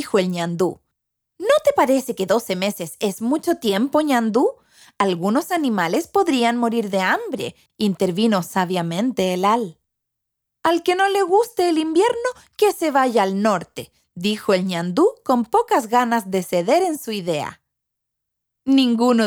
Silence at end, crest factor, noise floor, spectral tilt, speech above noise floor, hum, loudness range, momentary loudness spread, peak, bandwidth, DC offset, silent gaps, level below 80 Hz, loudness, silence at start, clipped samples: 0 s; 18 dB; -80 dBFS; -5 dB/octave; 61 dB; none; 2 LU; 7 LU; -2 dBFS; over 20 kHz; under 0.1%; none; -64 dBFS; -20 LUFS; 0 s; under 0.1%